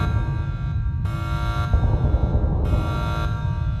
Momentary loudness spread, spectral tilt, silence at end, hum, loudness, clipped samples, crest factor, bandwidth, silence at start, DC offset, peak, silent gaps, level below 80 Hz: 5 LU; -8 dB/octave; 0 s; none; -24 LUFS; under 0.1%; 14 dB; 11.5 kHz; 0 s; under 0.1%; -8 dBFS; none; -24 dBFS